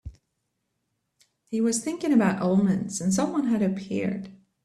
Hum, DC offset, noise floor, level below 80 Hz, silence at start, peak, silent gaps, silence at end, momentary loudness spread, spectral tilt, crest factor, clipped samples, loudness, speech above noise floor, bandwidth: none; under 0.1%; -78 dBFS; -56 dBFS; 0.05 s; -10 dBFS; none; 0.3 s; 9 LU; -6 dB/octave; 16 dB; under 0.1%; -25 LUFS; 54 dB; 13 kHz